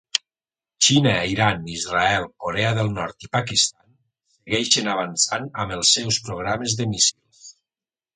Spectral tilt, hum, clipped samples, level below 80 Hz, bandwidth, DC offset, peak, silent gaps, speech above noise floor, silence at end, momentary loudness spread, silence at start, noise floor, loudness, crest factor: -2.5 dB/octave; none; under 0.1%; -50 dBFS; 9.6 kHz; under 0.1%; 0 dBFS; none; over 68 dB; 0.65 s; 9 LU; 0.15 s; under -90 dBFS; -20 LUFS; 22 dB